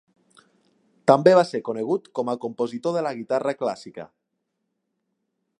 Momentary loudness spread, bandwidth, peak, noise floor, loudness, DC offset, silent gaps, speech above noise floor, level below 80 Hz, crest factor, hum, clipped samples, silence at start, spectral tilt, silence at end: 13 LU; 10.5 kHz; -2 dBFS; -78 dBFS; -23 LUFS; under 0.1%; none; 56 dB; -74 dBFS; 22 dB; none; under 0.1%; 1.05 s; -6.5 dB/octave; 1.55 s